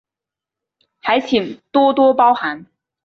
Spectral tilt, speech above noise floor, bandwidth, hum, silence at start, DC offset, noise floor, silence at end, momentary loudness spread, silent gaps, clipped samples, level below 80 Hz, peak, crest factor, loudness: -5.5 dB/octave; 72 dB; 6.8 kHz; none; 1.05 s; under 0.1%; -87 dBFS; 0.4 s; 13 LU; none; under 0.1%; -60 dBFS; -2 dBFS; 14 dB; -16 LUFS